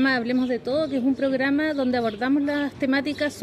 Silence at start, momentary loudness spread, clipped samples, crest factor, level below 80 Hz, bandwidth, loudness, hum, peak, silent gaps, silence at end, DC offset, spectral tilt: 0 s; 3 LU; under 0.1%; 12 dB; -58 dBFS; 11.5 kHz; -23 LUFS; none; -10 dBFS; none; 0 s; under 0.1%; -5.5 dB/octave